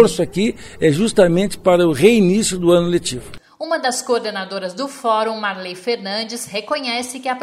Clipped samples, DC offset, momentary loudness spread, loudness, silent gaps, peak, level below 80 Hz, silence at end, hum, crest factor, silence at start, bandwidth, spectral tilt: under 0.1%; under 0.1%; 12 LU; -18 LUFS; none; 0 dBFS; -46 dBFS; 0 s; none; 18 dB; 0 s; 15 kHz; -4.5 dB/octave